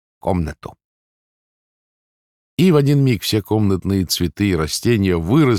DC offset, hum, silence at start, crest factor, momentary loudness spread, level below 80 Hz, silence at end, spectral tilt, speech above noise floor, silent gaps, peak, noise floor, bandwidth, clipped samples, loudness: under 0.1%; none; 0.25 s; 14 dB; 8 LU; -44 dBFS; 0 s; -6 dB/octave; over 74 dB; 0.84-2.57 s; -4 dBFS; under -90 dBFS; 17.5 kHz; under 0.1%; -17 LUFS